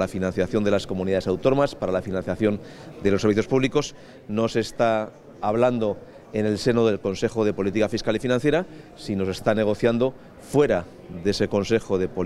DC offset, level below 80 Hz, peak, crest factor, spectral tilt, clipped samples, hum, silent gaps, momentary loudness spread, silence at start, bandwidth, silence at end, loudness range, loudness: under 0.1%; -48 dBFS; -4 dBFS; 18 dB; -6 dB/octave; under 0.1%; none; none; 8 LU; 0 s; 13.5 kHz; 0 s; 1 LU; -24 LUFS